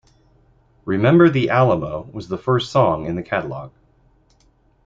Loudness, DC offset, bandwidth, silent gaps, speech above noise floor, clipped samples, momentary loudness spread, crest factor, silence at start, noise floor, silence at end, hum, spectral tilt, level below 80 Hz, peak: -18 LUFS; under 0.1%; 7.6 kHz; none; 40 dB; under 0.1%; 17 LU; 18 dB; 0.85 s; -58 dBFS; 1.15 s; none; -8 dB/octave; -50 dBFS; -2 dBFS